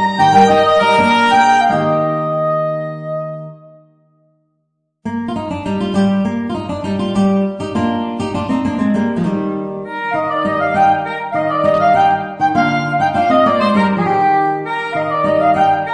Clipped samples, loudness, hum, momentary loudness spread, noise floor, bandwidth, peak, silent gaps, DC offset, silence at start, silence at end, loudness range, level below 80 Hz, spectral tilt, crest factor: under 0.1%; -15 LUFS; none; 11 LU; -68 dBFS; 10 kHz; 0 dBFS; none; under 0.1%; 0 s; 0 s; 8 LU; -48 dBFS; -6.5 dB/octave; 14 dB